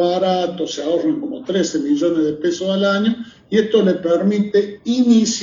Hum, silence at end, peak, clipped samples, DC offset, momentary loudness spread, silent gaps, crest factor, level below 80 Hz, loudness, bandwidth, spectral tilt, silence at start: none; 0 s; -2 dBFS; under 0.1%; under 0.1%; 7 LU; none; 14 dB; -58 dBFS; -18 LUFS; 7.6 kHz; -5 dB/octave; 0 s